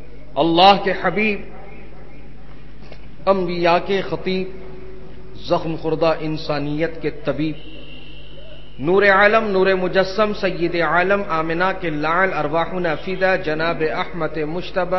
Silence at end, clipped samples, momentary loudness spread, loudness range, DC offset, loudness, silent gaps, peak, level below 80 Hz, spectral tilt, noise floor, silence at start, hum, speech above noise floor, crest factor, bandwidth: 0 s; under 0.1%; 22 LU; 6 LU; 4%; -19 LUFS; none; 0 dBFS; -44 dBFS; -6.5 dB/octave; -40 dBFS; 0 s; none; 22 dB; 20 dB; 6.2 kHz